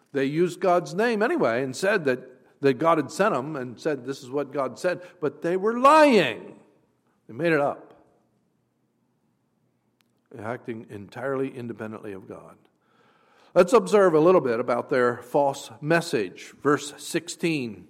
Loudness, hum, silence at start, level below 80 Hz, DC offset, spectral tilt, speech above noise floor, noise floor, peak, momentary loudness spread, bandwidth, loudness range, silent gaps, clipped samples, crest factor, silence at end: -23 LUFS; none; 0.15 s; -70 dBFS; under 0.1%; -5.5 dB/octave; 47 dB; -71 dBFS; -6 dBFS; 17 LU; 16 kHz; 13 LU; none; under 0.1%; 18 dB; 0.05 s